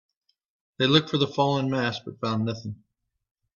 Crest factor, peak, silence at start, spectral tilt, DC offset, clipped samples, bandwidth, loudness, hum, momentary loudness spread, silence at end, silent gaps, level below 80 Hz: 24 dB; -4 dBFS; 0.8 s; -6 dB/octave; under 0.1%; under 0.1%; 7.2 kHz; -25 LUFS; none; 14 LU; 0.85 s; none; -64 dBFS